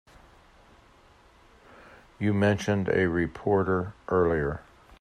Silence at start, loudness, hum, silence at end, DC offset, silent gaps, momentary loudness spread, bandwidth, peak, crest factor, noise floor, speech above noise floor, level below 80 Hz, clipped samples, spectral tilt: 2.2 s; -26 LUFS; none; 0.4 s; under 0.1%; none; 6 LU; 10.5 kHz; -10 dBFS; 18 dB; -57 dBFS; 32 dB; -52 dBFS; under 0.1%; -7 dB/octave